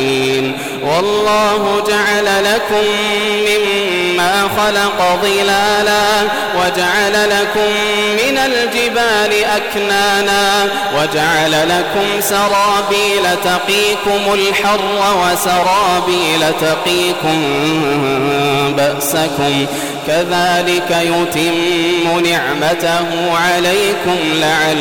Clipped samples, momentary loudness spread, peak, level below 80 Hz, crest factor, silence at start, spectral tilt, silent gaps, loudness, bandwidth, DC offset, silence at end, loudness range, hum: under 0.1%; 3 LU; -6 dBFS; -44 dBFS; 6 dB; 0 s; -3 dB/octave; none; -13 LUFS; 18 kHz; under 0.1%; 0 s; 1 LU; none